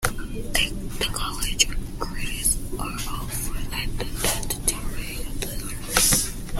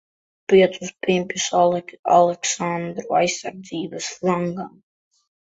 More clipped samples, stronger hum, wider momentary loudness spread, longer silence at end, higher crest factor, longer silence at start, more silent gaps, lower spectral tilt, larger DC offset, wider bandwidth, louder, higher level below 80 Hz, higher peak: neither; neither; about the same, 12 LU vs 14 LU; second, 0 s vs 0.9 s; first, 24 dB vs 18 dB; second, 0 s vs 0.5 s; second, none vs 1.99-2.03 s; second, -2 dB/octave vs -4 dB/octave; neither; first, 16.5 kHz vs 8 kHz; second, -25 LUFS vs -21 LUFS; first, -32 dBFS vs -62 dBFS; about the same, -2 dBFS vs -2 dBFS